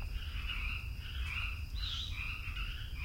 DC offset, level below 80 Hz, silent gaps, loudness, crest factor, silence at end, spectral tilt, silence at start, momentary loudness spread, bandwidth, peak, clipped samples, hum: under 0.1%; -42 dBFS; none; -40 LUFS; 12 dB; 0 s; -3.5 dB/octave; 0 s; 4 LU; 16 kHz; -26 dBFS; under 0.1%; none